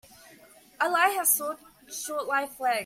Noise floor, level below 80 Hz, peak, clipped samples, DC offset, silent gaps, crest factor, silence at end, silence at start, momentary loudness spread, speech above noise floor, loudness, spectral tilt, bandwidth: -54 dBFS; -72 dBFS; -8 dBFS; under 0.1%; under 0.1%; none; 20 dB; 0 s; 0.3 s; 14 LU; 27 dB; -26 LUFS; 0 dB/octave; 16.5 kHz